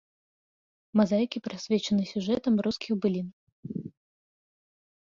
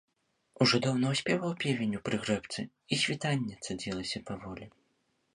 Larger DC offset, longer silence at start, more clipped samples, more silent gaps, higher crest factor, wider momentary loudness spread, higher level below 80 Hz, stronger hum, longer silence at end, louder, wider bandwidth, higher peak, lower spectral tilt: neither; first, 0.95 s vs 0.6 s; neither; first, 3.33-3.63 s vs none; about the same, 18 dB vs 22 dB; about the same, 14 LU vs 13 LU; about the same, -66 dBFS vs -62 dBFS; neither; first, 1.15 s vs 0.65 s; first, -28 LUFS vs -31 LUFS; second, 7.4 kHz vs 11.5 kHz; about the same, -12 dBFS vs -10 dBFS; first, -6.5 dB/octave vs -4.5 dB/octave